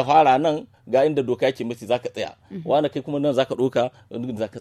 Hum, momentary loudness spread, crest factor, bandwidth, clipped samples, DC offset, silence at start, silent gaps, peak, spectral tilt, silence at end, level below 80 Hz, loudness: none; 13 LU; 18 dB; 13 kHz; under 0.1%; under 0.1%; 0 s; none; -4 dBFS; -6.5 dB/octave; 0 s; -64 dBFS; -22 LUFS